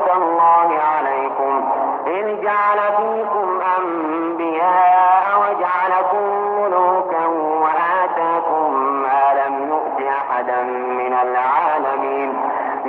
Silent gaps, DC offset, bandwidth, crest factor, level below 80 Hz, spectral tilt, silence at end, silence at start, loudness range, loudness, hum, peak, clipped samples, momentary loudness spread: none; under 0.1%; 4.4 kHz; 12 dB; -72 dBFS; -7.5 dB/octave; 0 s; 0 s; 3 LU; -17 LUFS; none; -4 dBFS; under 0.1%; 7 LU